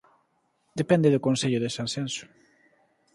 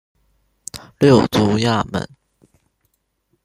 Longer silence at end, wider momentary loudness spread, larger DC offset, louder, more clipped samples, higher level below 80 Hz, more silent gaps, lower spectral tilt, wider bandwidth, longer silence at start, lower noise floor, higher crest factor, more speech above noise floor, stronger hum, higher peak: second, 0.9 s vs 1.4 s; second, 13 LU vs 21 LU; neither; second, -25 LUFS vs -16 LUFS; neither; second, -66 dBFS vs -50 dBFS; neither; about the same, -5.5 dB/octave vs -6 dB/octave; second, 11.5 kHz vs 15.5 kHz; about the same, 0.75 s vs 0.75 s; about the same, -71 dBFS vs -68 dBFS; about the same, 22 dB vs 18 dB; second, 46 dB vs 52 dB; neither; second, -6 dBFS vs -2 dBFS